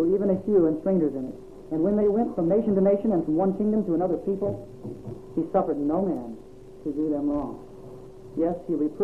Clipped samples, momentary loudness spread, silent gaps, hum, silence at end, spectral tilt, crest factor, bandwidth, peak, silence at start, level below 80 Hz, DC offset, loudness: under 0.1%; 18 LU; none; none; 0 s; -11 dB/octave; 14 dB; 5.4 kHz; -10 dBFS; 0 s; -50 dBFS; 0.3%; -25 LUFS